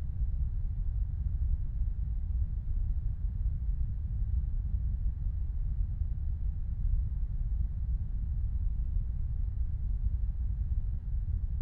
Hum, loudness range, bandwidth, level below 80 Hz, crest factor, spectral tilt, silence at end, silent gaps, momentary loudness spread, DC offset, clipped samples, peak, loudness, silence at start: none; 0 LU; 1.7 kHz; -32 dBFS; 12 dB; -11.5 dB/octave; 0 s; none; 2 LU; under 0.1%; under 0.1%; -20 dBFS; -36 LUFS; 0 s